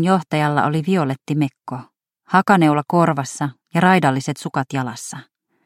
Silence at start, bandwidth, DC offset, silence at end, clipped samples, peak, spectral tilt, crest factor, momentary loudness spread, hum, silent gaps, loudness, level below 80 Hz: 0 s; 15.5 kHz; under 0.1%; 0.45 s; under 0.1%; 0 dBFS; -6 dB/octave; 18 dB; 17 LU; none; none; -18 LUFS; -64 dBFS